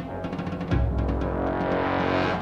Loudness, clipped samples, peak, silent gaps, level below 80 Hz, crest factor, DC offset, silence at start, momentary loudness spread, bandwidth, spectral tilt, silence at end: -26 LUFS; under 0.1%; -12 dBFS; none; -32 dBFS; 14 dB; under 0.1%; 0 s; 7 LU; 7 kHz; -8 dB/octave; 0 s